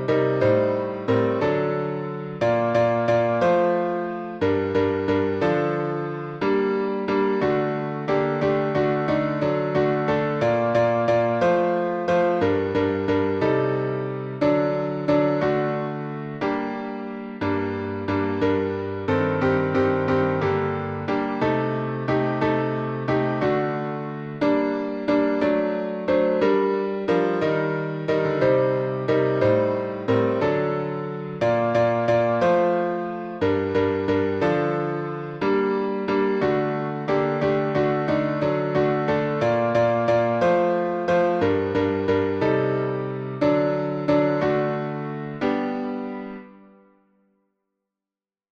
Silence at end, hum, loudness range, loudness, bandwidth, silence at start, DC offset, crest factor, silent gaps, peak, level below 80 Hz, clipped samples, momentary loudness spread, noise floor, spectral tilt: 2.1 s; none; 3 LU; -23 LUFS; 7.4 kHz; 0 s; under 0.1%; 14 dB; none; -8 dBFS; -56 dBFS; under 0.1%; 7 LU; under -90 dBFS; -8 dB/octave